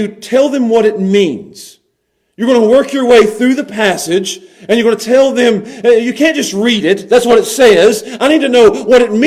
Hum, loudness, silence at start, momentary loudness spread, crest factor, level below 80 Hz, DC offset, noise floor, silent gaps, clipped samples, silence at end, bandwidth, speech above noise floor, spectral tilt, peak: none; -10 LUFS; 0 s; 7 LU; 10 dB; -48 dBFS; under 0.1%; -64 dBFS; none; 0.3%; 0 s; 15 kHz; 54 dB; -4 dB/octave; 0 dBFS